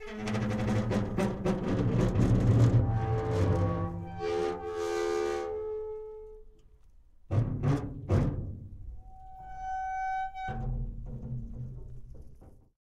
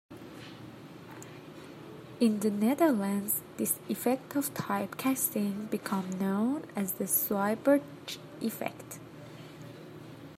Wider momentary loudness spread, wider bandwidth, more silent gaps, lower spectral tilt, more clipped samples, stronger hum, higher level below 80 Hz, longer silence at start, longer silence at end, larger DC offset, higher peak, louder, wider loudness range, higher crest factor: about the same, 20 LU vs 20 LU; second, 10 kHz vs 16 kHz; neither; first, -8 dB/octave vs -5 dB/octave; neither; neither; first, -42 dBFS vs -74 dBFS; about the same, 0 s vs 0.1 s; first, 0.2 s vs 0 s; neither; about the same, -14 dBFS vs -12 dBFS; about the same, -31 LUFS vs -31 LUFS; first, 10 LU vs 2 LU; about the same, 18 dB vs 20 dB